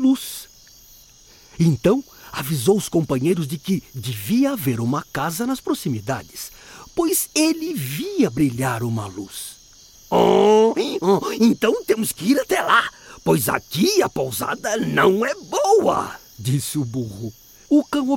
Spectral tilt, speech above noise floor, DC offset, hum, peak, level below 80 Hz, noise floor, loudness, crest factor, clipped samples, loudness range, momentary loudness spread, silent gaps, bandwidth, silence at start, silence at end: -5 dB/octave; 29 dB; under 0.1%; none; -2 dBFS; -52 dBFS; -49 dBFS; -20 LUFS; 18 dB; under 0.1%; 5 LU; 13 LU; none; 17 kHz; 0 s; 0 s